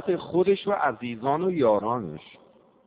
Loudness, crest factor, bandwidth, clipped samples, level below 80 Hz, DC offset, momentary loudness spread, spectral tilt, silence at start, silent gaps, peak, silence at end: -25 LUFS; 16 dB; 4.9 kHz; under 0.1%; -64 dBFS; under 0.1%; 8 LU; -5.5 dB/octave; 0 s; none; -10 dBFS; 0.65 s